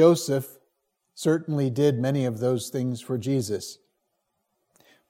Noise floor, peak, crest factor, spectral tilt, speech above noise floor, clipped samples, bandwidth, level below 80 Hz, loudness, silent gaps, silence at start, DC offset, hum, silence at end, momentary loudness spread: -77 dBFS; -6 dBFS; 20 dB; -6.5 dB/octave; 53 dB; under 0.1%; 16.5 kHz; -70 dBFS; -26 LUFS; none; 0 s; under 0.1%; none; 1.35 s; 8 LU